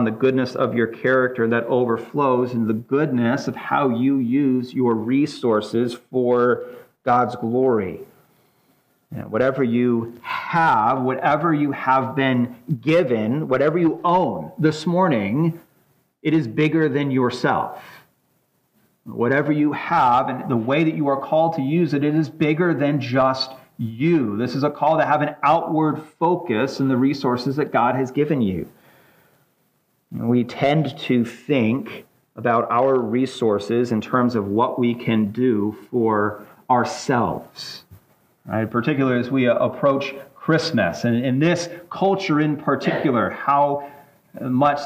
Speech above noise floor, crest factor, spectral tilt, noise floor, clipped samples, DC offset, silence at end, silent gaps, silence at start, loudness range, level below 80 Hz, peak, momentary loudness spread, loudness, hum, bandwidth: 46 dB; 16 dB; -7 dB/octave; -66 dBFS; under 0.1%; under 0.1%; 0 s; none; 0 s; 3 LU; -62 dBFS; -4 dBFS; 7 LU; -20 LUFS; none; 15.5 kHz